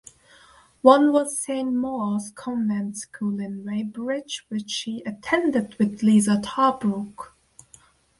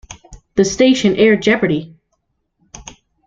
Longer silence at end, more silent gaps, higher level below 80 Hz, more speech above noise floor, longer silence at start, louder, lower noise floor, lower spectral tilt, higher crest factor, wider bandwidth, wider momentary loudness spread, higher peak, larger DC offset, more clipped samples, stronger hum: first, 0.95 s vs 0.45 s; neither; second, -64 dBFS vs -46 dBFS; second, 32 dB vs 55 dB; first, 0.85 s vs 0.1 s; second, -23 LUFS vs -14 LUFS; second, -55 dBFS vs -68 dBFS; about the same, -5 dB/octave vs -4.5 dB/octave; first, 22 dB vs 16 dB; first, 11.5 kHz vs 7.8 kHz; second, 13 LU vs 24 LU; about the same, -2 dBFS vs -2 dBFS; neither; neither; neither